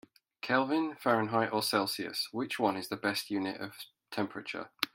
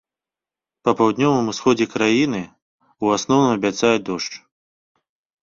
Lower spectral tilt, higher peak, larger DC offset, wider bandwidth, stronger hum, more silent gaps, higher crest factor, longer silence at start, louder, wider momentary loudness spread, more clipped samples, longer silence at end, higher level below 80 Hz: about the same, -4 dB/octave vs -5 dB/octave; second, -8 dBFS vs -2 dBFS; neither; first, 16.5 kHz vs 7.6 kHz; neither; second, none vs 2.62-2.79 s; first, 24 dB vs 18 dB; second, 0.45 s vs 0.85 s; second, -33 LUFS vs -19 LUFS; about the same, 12 LU vs 11 LU; neither; second, 0.1 s vs 1.05 s; second, -78 dBFS vs -58 dBFS